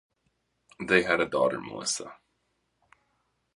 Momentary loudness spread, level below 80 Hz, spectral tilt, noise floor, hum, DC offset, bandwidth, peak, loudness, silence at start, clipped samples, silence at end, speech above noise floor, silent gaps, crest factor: 14 LU; -64 dBFS; -3 dB/octave; -76 dBFS; none; under 0.1%; 11.5 kHz; -6 dBFS; -27 LUFS; 0.8 s; under 0.1%; 1.4 s; 49 dB; none; 24 dB